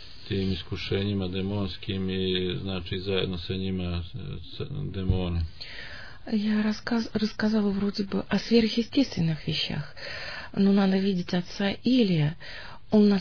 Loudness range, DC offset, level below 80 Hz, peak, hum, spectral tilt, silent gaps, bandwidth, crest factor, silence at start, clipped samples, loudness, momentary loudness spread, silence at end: 5 LU; 0.8%; -46 dBFS; -8 dBFS; none; -7 dB/octave; none; 5.4 kHz; 18 dB; 0 s; under 0.1%; -27 LUFS; 13 LU; 0 s